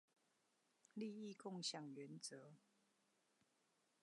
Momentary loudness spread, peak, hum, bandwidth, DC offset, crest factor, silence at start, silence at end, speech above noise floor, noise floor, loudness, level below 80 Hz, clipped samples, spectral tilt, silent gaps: 12 LU; -34 dBFS; none; 11 kHz; under 0.1%; 22 dB; 0.95 s; 1.45 s; 31 dB; -84 dBFS; -52 LUFS; under -90 dBFS; under 0.1%; -3.5 dB/octave; none